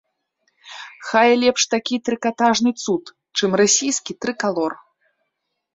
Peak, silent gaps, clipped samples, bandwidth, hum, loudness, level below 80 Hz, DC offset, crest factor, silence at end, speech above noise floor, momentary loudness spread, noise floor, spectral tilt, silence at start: -2 dBFS; none; under 0.1%; 8 kHz; none; -19 LUFS; -66 dBFS; under 0.1%; 18 dB; 1 s; 58 dB; 16 LU; -76 dBFS; -2.5 dB/octave; 0.65 s